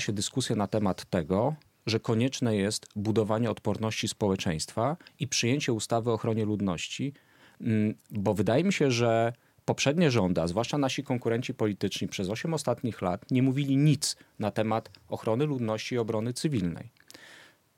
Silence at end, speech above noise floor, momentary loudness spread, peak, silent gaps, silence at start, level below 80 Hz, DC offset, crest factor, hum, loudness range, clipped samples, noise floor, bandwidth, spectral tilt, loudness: 0.35 s; 27 dB; 8 LU; -12 dBFS; none; 0 s; -62 dBFS; under 0.1%; 18 dB; none; 3 LU; under 0.1%; -55 dBFS; 16 kHz; -5.5 dB/octave; -29 LUFS